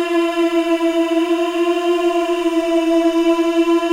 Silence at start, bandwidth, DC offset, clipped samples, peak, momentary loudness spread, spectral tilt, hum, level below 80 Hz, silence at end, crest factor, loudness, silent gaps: 0 s; 14 kHz; under 0.1%; under 0.1%; -6 dBFS; 2 LU; -2.5 dB/octave; none; -54 dBFS; 0 s; 10 dB; -17 LUFS; none